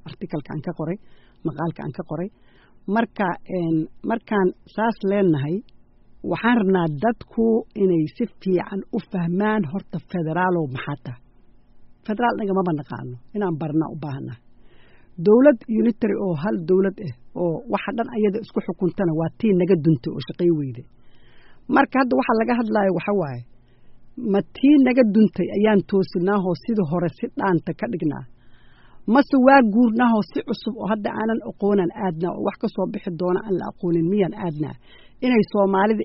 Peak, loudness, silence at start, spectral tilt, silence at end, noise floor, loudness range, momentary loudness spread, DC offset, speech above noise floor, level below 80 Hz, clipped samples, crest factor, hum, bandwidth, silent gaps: -2 dBFS; -22 LUFS; 0.05 s; -6.5 dB/octave; 0 s; -50 dBFS; 6 LU; 13 LU; under 0.1%; 29 dB; -54 dBFS; under 0.1%; 20 dB; none; 5.8 kHz; none